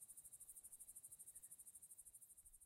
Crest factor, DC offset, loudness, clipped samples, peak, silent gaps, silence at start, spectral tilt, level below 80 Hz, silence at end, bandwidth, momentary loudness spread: 20 dB; under 0.1%; -59 LUFS; under 0.1%; -44 dBFS; none; 0 s; -0.5 dB/octave; -82 dBFS; 0 s; 16 kHz; 4 LU